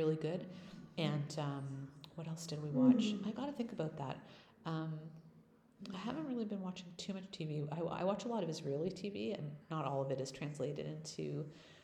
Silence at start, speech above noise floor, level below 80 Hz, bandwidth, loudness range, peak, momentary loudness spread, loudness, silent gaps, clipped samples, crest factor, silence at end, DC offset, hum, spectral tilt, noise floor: 0 s; 26 dB; -76 dBFS; 11.5 kHz; 7 LU; -18 dBFS; 12 LU; -41 LUFS; none; under 0.1%; 22 dB; 0 s; under 0.1%; none; -6.5 dB/octave; -66 dBFS